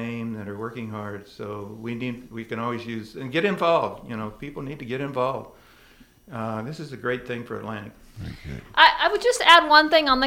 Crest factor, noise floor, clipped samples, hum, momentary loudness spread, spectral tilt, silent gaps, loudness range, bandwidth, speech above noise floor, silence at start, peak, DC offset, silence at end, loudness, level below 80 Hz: 24 dB; -53 dBFS; under 0.1%; none; 21 LU; -4 dB/octave; none; 13 LU; 16.5 kHz; 30 dB; 0 s; 0 dBFS; under 0.1%; 0 s; -22 LUFS; -52 dBFS